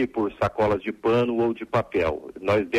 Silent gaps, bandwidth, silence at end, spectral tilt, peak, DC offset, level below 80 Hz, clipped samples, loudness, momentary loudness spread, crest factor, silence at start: none; 12 kHz; 0 s; -7.5 dB/octave; -12 dBFS; under 0.1%; -48 dBFS; under 0.1%; -24 LUFS; 4 LU; 12 dB; 0 s